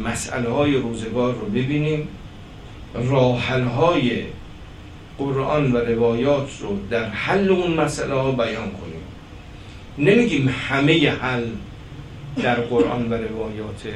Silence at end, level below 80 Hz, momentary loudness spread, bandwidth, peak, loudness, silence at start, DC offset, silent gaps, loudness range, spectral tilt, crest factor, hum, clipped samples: 0 s; -42 dBFS; 22 LU; 12.5 kHz; -2 dBFS; -21 LUFS; 0 s; under 0.1%; none; 2 LU; -6 dB/octave; 20 dB; none; under 0.1%